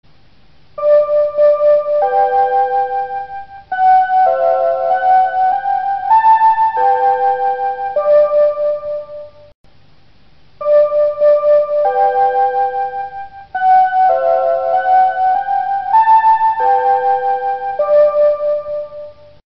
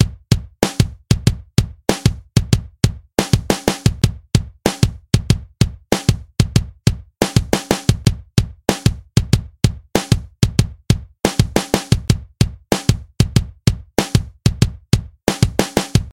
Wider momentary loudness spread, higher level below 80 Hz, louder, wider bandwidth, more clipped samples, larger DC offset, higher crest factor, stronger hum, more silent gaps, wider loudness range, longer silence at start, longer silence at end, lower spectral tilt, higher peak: first, 12 LU vs 3 LU; second, -54 dBFS vs -28 dBFS; first, -13 LUFS vs -19 LUFS; second, 5.6 kHz vs 17.5 kHz; neither; first, 0.7% vs under 0.1%; second, 12 dB vs 18 dB; neither; first, 9.55-9.64 s vs none; first, 4 LU vs 1 LU; first, 0.75 s vs 0 s; first, 0.4 s vs 0.05 s; second, -1 dB/octave vs -5.5 dB/octave; about the same, -2 dBFS vs 0 dBFS